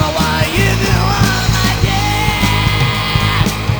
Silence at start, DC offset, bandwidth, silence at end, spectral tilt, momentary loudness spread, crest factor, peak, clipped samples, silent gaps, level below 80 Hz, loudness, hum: 0 s; under 0.1%; over 20 kHz; 0 s; -4.5 dB/octave; 1 LU; 12 dB; 0 dBFS; under 0.1%; none; -22 dBFS; -13 LUFS; none